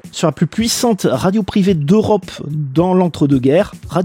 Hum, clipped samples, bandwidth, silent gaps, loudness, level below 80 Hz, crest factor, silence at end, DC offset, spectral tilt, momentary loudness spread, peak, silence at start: none; under 0.1%; 16.5 kHz; none; -15 LUFS; -42 dBFS; 12 dB; 0 s; under 0.1%; -6 dB/octave; 6 LU; -2 dBFS; 0.05 s